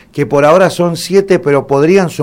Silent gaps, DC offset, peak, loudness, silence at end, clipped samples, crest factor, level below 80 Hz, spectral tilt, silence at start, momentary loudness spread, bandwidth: none; under 0.1%; 0 dBFS; -10 LUFS; 0 s; 0.3%; 10 dB; -46 dBFS; -6 dB/octave; 0.15 s; 5 LU; 16.5 kHz